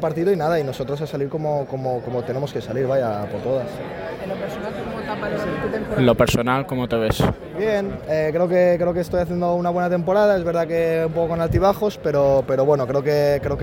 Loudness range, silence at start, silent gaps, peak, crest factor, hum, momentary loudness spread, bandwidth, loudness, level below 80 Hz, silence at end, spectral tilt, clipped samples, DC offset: 6 LU; 0 s; none; -4 dBFS; 16 dB; none; 9 LU; 17 kHz; -21 LUFS; -40 dBFS; 0 s; -7 dB/octave; under 0.1%; under 0.1%